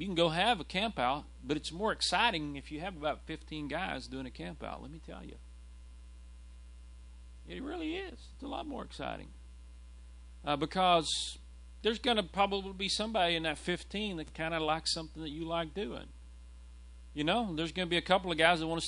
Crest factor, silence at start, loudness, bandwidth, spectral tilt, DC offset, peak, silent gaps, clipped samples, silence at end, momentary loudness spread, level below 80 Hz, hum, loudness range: 26 dB; 0 s; -33 LUFS; 11 kHz; -4 dB/octave; under 0.1%; -10 dBFS; none; under 0.1%; 0 s; 26 LU; -52 dBFS; none; 13 LU